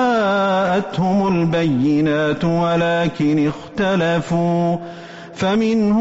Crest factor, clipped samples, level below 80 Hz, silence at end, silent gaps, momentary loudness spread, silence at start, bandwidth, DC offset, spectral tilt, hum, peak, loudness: 8 dB; under 0.1%; -48 dBFS; 0 s; none; 5 LU; 0 s; 8 kHz; under 0.1%; -5.5 dB/octave; none; -8 dBFS; -18 LUFS